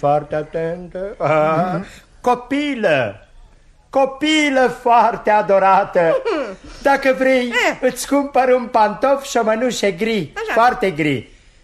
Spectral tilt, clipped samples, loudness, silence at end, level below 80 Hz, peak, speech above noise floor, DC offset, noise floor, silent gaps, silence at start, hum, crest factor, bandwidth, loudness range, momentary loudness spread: -4.5 dB/octave; under 0.1%; -17 LUFS; 0.4 s; -48 dBFS; -2 dBFS; 31 dB; under 0.1%; -47 dBFS; none; 0 s; none; 14 dB; 13.5 kHz; 4 LU; 10 LU